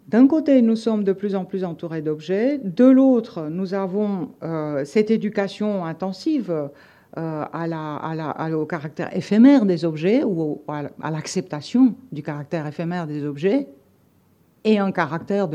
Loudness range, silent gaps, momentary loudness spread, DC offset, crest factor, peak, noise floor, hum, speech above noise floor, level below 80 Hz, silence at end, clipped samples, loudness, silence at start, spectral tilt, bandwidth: 6 LU; none; 13 LU; under 0.1%; 18 dB; -4 dBFS; -58 dBFS; none; 38 dB; -70 dBFS; 0 s; under 0.1%; -21 LUFS; 0.1 s; -7.5 dB/octave; 9.2 kHz